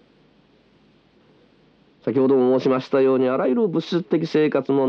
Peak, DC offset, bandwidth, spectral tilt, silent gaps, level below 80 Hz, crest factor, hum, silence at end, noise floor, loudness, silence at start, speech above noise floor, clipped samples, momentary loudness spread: -6 dBFS; under 0.1%; 6.6 kHz; -8 dB/octave; none; -74 dBFS; 14 dB; none; 0 s; -57 dBFS; -20 LUFS; 2.05 s; 38 dB; under 0.1%; 6 LU